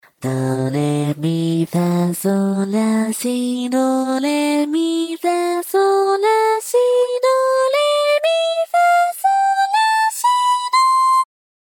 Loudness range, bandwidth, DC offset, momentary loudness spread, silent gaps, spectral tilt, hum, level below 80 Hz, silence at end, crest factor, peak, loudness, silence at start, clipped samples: 3 LU; 19 kHz; under 0.1%; 5 LU; none; -5 dB/octave; none; -70 dBFS; 0.5 s; 10 dB; -6 dBFS; -17 LUFS; 0.2 s; under 0.1%